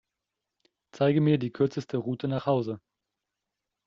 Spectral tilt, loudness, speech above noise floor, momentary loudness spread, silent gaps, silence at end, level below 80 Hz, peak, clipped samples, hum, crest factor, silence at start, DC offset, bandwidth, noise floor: -7.5 dB/octave; -27 LUFS; 60 dB; 8 LU; none; 1.1 s; -68 dBFS; -12 dBFS; under 0.1%; none; 18 dB; 0.95 s; under 0.1%; 7.2 kHz; -86 dBFS